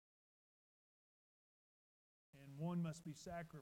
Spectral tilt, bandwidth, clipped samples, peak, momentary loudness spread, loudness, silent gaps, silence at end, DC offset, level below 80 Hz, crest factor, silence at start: -6.5 dB/octave; 14.5 kHz; under 0.1%; -36 dBFS; 15 LU; -48 LUFS; none; 0 s; under 0.1%; -78 dBFS; 16 dB; 2.35 s